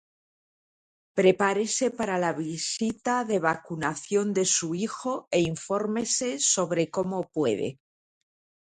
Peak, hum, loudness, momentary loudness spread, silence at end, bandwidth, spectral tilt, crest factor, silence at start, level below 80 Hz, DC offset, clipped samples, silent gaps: -8 dBFS; none; -26 LUFS; 7 LU; 0.95 s; 10.5 kHz; -3.5 dB/octave; 20 dB; 1.15 s; -66 dBFS; under 0.1%; under 0.1%; none